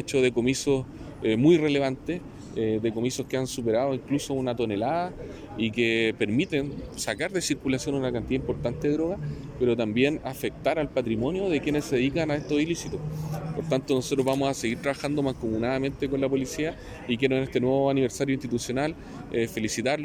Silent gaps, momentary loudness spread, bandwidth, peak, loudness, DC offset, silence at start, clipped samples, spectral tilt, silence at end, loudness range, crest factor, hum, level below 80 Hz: none; 9 LU; 17 kHz; -10 dBFS; -27 LUFS; under 0.1%; 0 s; under 0.1%; -5.5 dB/octave; 0 s; 2 LU; 18 dB; none; -50 dBFS